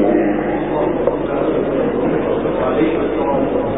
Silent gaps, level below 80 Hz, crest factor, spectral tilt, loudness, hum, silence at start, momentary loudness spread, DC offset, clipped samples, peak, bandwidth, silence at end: none; -38 dBFS; 14 dB; -11.5 dB/octave; -17 LUFS; none; 0 s; 2 LU; 0.9%; under 0.1%; -2 dBFS; 3.9 kHz; 0 s